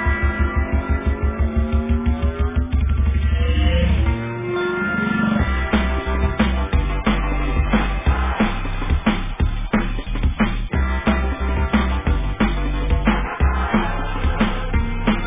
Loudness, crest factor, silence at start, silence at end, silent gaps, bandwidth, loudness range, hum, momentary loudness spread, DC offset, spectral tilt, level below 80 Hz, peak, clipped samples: -21 LUFS; 16 dB; 0 s; 0 s; none; 3.8 kHz; 2 LU; none; 4 LU; under 0.1%; -10.5 dB/octave; -20 dBFS; -4 dBFS; under 0.1%